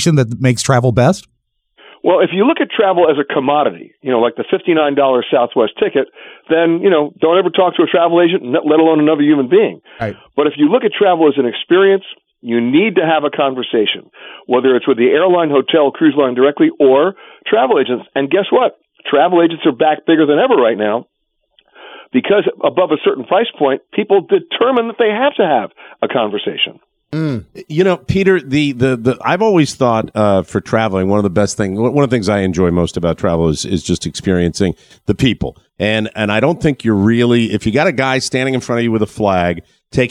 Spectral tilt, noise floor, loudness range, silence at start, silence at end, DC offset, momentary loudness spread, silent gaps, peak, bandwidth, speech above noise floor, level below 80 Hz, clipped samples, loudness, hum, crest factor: -6 dB/octave; -58 dBFS; 4 LU; 0 s; 0 s; under 0.1%; 7 LU; none; 0 dBFS; 12 kHz; 45 dB; -44 dBFS; under 0.1%; -14 LUFS; none; 14 dB